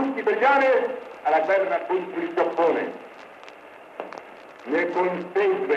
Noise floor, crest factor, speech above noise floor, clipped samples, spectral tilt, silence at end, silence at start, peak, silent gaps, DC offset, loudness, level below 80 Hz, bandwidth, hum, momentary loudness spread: -45 dBFS; 16 dB; 23 dB; under 0.1%; -6 dB/octave; 0 s; 0 s; -8 dBFS; none; under 0.1%; -23 LUFS; -76 dBFS; 8.4 kHz; none; 23 LU